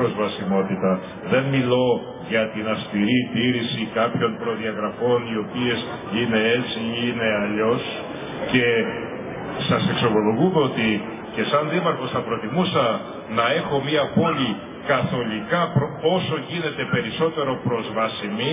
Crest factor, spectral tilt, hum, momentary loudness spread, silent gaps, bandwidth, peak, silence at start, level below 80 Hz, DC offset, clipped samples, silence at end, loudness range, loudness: 18 dB; -10 dB/octave; none; 7 LU; none; 3.9 kHz; -4 dBFS; 0 s; -54 dBFS; under 0.1%; under 0.1%; 0 s; 2 LU; -22 LUFS